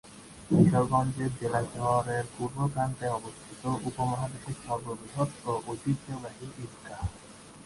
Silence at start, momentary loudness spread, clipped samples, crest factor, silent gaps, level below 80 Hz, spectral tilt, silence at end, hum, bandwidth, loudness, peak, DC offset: 0.05 s; 17 LU; under 0.1%; 22 dB; none; -52 dBFS; -7 dB/octave; 0 s; none; 11.5 kHz; -30 LUFS; -8 dBFS; under 0.1%